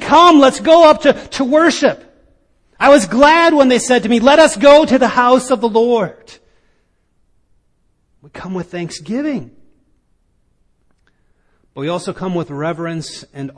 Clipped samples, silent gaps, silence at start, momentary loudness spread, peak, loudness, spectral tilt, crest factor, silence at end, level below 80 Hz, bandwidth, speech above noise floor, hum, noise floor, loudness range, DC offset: under 0.1%; none; 0 s; 18 LU; 0 dBFS; -11 LUFS; -4 dB/octave; 14 dB; 0.05 s; -48 dBFS; 10.5 kHz; 48 dB; none; -60 dBFS; 17 LU; under 0.1%